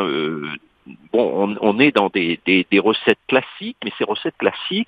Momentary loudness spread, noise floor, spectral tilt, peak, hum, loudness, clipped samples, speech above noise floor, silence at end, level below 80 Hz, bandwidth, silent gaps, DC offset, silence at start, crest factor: 13 LU; -44 dBFS; -7 dB/octave; 0 dBFS; none; -18 LUFS; under 0.1%; 26 dB; 0.05 s; -62 dBFS; 5.2 kHz; none; under 0.1%; 0 s; 20 dB